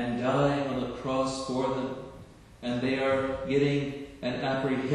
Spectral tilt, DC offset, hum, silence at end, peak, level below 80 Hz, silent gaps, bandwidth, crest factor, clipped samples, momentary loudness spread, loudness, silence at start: -6 dB/octave; under 0.1%; none; 0 s; -12 dBFS; -54 dBFS; none; 11 kHz; 16 dB; under 0.1%; 10 LU; -29 LUFS; 0 s